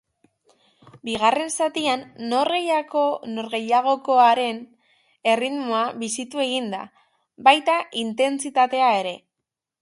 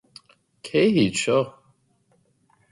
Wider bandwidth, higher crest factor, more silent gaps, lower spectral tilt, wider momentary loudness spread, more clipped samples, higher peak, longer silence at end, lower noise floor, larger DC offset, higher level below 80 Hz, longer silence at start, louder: about the same, 11.5 kHz vs 11.5 kHz; first, 22 dB vs 16 dB; neither; second, -2.5 dB/octave vs -5 dB/octave; about the same, 12 LU vs 13 LU; neither; first, 0 dBFS vs -8 dBFS; second, 0.65 s vs 1.2 s; first, -84 dBFS vs -65 dBFS; neither; second, -68 dBFS vs -62 dBFS; first, 1.05 s vs 0.65 s; about the same, -21 LUFS vs -22 LUFS